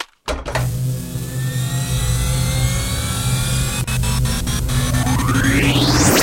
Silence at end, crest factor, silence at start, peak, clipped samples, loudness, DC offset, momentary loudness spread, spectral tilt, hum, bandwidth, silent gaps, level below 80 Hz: 0 s; 18 dB; 0 s; 0 dBFS; under 0.1%; -18 LUFS; under 0.1%; 9 LU; -4 dB/octave; none; 16.5 kHz; none; -26 dBFS